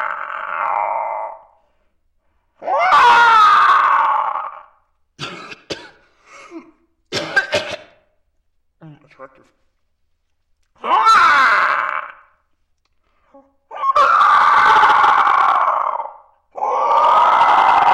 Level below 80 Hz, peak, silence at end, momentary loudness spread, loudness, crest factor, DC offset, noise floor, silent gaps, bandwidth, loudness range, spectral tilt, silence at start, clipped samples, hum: -58 dBFS; -2 dBFS; 0 s; 21 LU; -13 LUFS; 14 dB; under 0.1%; -65 dBFS; none; 12.5 kHz; 12 LU; -2 dB/octave; 0 s; under 0.1%; none